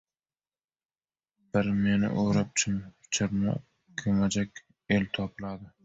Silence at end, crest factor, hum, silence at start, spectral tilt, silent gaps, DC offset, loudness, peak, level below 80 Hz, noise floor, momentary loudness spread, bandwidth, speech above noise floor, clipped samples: 0.15 s; 18 dB; none; 1.55 s; -5 dB/octave; none; under 0.1%; -29 LUFS; -12 dBFS; -54 dBFS; under -90 dBFS; 11 LU; 8 kHz; over 62 dB; under 0.1%